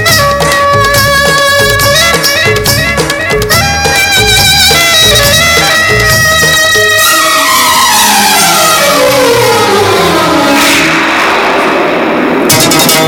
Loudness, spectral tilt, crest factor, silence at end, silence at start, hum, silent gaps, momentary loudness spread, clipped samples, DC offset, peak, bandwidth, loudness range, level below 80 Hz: -5 LUFS; -2.5 dB/octave; 6 dB; 0 s; 0 s; none; none; 5 LU; 2%; under 0.1%; 0 dBFS; over 20 kHz; 2 LU; -26 dBFS